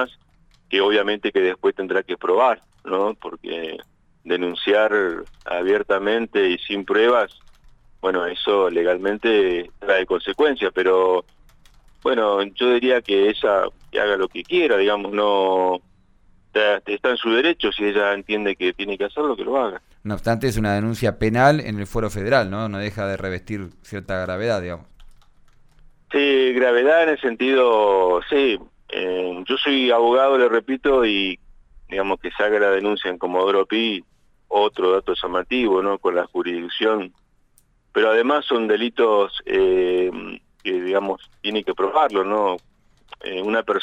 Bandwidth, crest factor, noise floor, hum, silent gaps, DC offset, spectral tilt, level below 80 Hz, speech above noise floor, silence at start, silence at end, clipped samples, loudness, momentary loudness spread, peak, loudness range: 12.5 kHz; 16 dB; -59 dBFS; none; none; under 0.1%; -5.5 dB/octave; -48 dBFS; 39 dB; 0 s; 0 s; under 0.1%; -20 LUFS; 10 LU; -4 dBFS; 4 LU